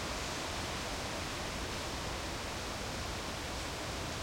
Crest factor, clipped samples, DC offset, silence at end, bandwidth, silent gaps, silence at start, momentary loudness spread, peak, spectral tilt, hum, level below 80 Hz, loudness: 14 dB; under 0.1%; under 0.1%; 0 s; 16.5 kHz; none; 0 s; 1 LU; -26 dBFS; -3 dB/octave; none; -48 dBFS; -38 LUFS